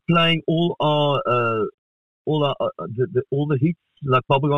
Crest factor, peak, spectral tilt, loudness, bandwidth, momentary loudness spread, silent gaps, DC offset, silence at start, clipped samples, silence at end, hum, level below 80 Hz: 16 dB; -6 dBFS; -8 dB/octave; -21 LUFS; 6 kHz; 8 LU; 1.74-2.25 s; 0.4%; 0.1 s; under 0.1%; 0 s; none; -58 dBFS